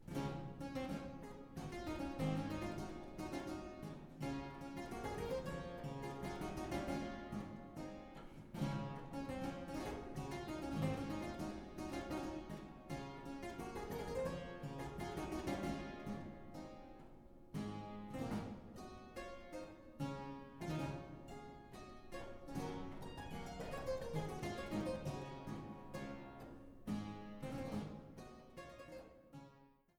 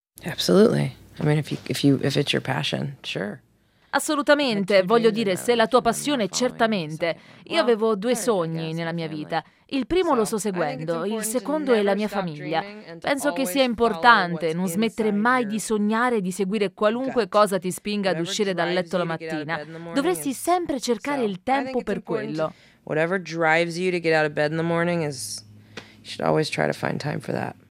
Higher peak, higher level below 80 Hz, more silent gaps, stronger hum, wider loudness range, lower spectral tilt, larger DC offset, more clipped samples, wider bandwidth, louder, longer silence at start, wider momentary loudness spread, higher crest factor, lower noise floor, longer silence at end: second, -26 dBFS vs 0 dBFS; about the same, -60 dBFS vs -58 dBFS; neither; neither; about the same, 4 LU vs 4 LU; first, -6.5 dB/octave vs -5 dB/octave; neither; neither; first, 19 kHz vs 16 kHz; second, -47 LUFS vs -23 LUFS; second, 0 s vs 0.25 s; about the same, 12 LU vs 10 LU; about the same, 20 dB vs 22 dB; first, -68 dBFS vs -44 dBFS; about the same, 0.25 s vs 0.2 s